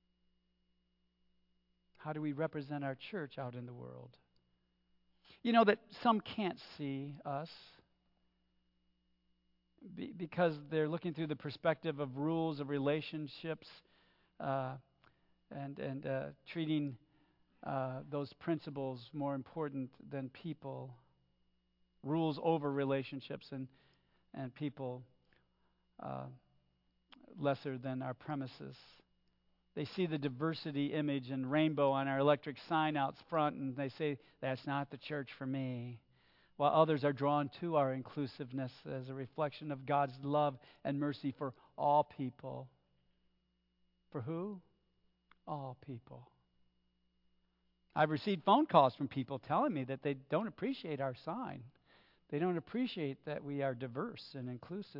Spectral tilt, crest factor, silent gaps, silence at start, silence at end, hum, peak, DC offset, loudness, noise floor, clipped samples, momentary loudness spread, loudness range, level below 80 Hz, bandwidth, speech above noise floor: -5.5 dB/octave; 26 dB; none; 2 s; 0 s; none; -14 dBFS; under 0.1%; -38 LUFS; -80 dBFS; under 0.1%; 15 LU; 13 LU; -80 dBFS; 5.8 kHz; 42 dB